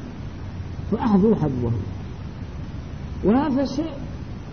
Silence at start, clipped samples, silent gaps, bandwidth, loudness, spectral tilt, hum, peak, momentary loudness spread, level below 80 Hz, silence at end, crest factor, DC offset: 0 s; under 0.1%; none; 6.6 kHz; -24 LUFS; -8.5 dB/octave; none; -6 dBFS; 16 LU; -38 dBFS; 0 s; 18 dB; 0.6%